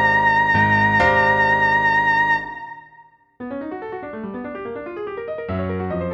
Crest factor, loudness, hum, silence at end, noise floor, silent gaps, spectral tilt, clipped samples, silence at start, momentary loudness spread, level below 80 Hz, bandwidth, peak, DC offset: 14 dB; -17 LUFS; none; 0 s; -50 dBFS; none; -6.5 dB/octave; under 0.1%; 0 s; 16 LU; -46 dBFS; 7.8 kHz; -4 dBFS; under 0.1%